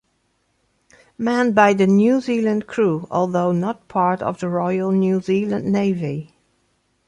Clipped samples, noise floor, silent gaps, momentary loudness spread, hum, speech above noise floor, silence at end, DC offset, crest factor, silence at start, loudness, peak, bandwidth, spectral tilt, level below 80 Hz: under 0.1%; -67 dBFS; none; 9 LU; none; 49 dB; 0.85 s; under 0.1%; 18 dB; 1.2 s; -19 LUFS; -2 dBFS; 9.8 kHz; -7.5 dB/octave; -60 dBFS